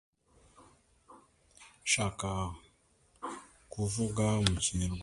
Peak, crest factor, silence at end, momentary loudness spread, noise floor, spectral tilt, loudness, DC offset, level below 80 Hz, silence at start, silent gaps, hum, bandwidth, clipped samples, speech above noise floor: -8 dBFS; 28 dB; 0 s; 17 LU; -68 dBFS; -4 dB/octave; -33 LUFS; under 0.1%; -50 dBFS; 0.6 s; none; none; 11.5 kHz; under 0.1%; 36 dB